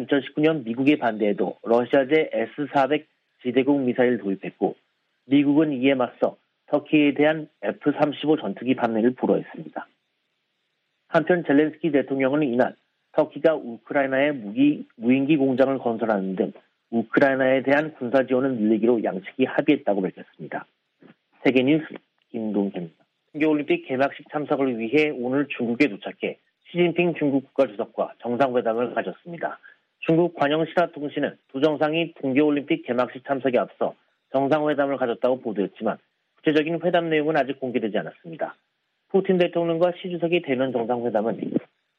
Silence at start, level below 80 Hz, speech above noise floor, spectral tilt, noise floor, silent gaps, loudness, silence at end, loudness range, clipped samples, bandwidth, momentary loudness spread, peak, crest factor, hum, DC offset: 0 s; -72 dBFS; 52 dB; -8 dB/octave; -74 dBFS; none; -23 LUFS; 0.35 s; 3 LU; under 0.1%; 6 kHz; 10 LU; -6 dBFS; 18 dB; none; under 0.1%